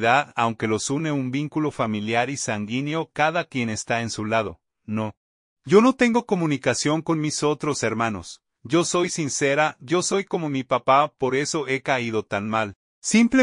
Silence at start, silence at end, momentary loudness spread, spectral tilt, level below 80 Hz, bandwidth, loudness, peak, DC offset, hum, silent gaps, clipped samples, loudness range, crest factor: 0 s; 0 s; 8 LU; -4.5 dB/octave; -60 dBFS; 11 kHz; -23 LUFS; -4 dBFS; under 0.1%; none; 5.17-5.56 s, 12.75-13.02 s; under 0.1%; 3 LU; 20 dB